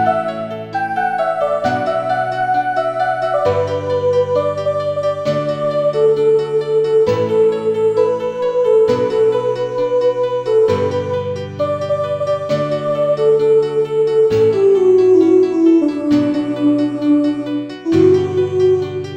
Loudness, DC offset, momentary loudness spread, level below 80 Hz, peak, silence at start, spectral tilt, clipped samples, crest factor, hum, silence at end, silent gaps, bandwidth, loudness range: -15 LUFS; under 0.1%; 7 LU; -56 dBFS; -2 dBFS; 0 s; -7.5 dB/octave; under 0.1%; 12 dB; none; 0 s; none; 9.4 kHz; 4 LU